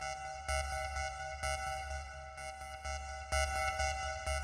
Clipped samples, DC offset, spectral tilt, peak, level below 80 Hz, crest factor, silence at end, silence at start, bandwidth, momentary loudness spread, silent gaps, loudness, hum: under 0.1%; under 0.1%; -2.5 dB/octave; -20 dBFS; -44 dBFS; 18 dB; 0 s; 0 s; 14 kHz; 10 LU; none; -39 LUFS; none